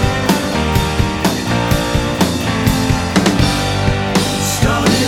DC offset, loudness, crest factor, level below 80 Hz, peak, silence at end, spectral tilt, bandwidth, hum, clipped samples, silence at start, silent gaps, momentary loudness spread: under 0.1%; -15 LUFS; 14 dB; -26 dBFS; 0 dBFS; 0 s; -4.5 dB/octave; 17.5 kHz; none; under 0.1%; 0 s; none; 2 LU